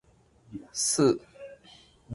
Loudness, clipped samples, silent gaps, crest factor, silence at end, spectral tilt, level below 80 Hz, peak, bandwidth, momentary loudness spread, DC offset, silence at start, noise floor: -26 LUFS; under 0.1%; none; 20 dB; 0 s; -4 dB/octave; -64 dBFS; -10 dBFS; 11.5 kHz; 24 LU; under 0.1%; 0.5 s; -60 dBFS